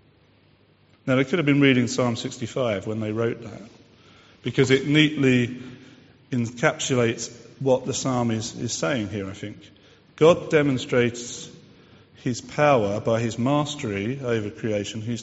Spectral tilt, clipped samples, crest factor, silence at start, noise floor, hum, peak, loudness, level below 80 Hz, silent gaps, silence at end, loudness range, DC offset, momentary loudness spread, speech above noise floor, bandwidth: -5 dB/octave; under 0.1%; 22 dB; 1.05 s; -58 dBFS; none; -2 dBFS; -23 LUFS; -58 dBFS; none; 0 s; 3 LU; under 0.1%; 16 LU; 35 dB; 8 kHz